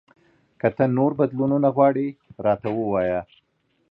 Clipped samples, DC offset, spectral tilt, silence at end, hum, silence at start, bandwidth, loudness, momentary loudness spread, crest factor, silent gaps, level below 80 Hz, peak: under 0.1%; under 0.1%; -11.5 dB/octave; 0.7 s; none; 0.65 s; 4.3 kHz; -22 LUFS; 8 LU; 18 dB; none; -56 dBFS; -4 dBFS